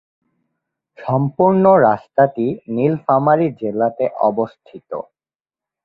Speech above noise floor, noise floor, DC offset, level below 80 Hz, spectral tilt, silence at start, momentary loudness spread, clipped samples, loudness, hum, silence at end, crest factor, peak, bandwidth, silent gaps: over 74 dB; under -90 dBFS; under 0.1%; -60 dBFS; -11.5 dB/octave; 1 s; 17 LU; under 0.1%; -16 LUFS; none; 0.85 s; 16 dB; -2 dBFS; 5.2 kHz; none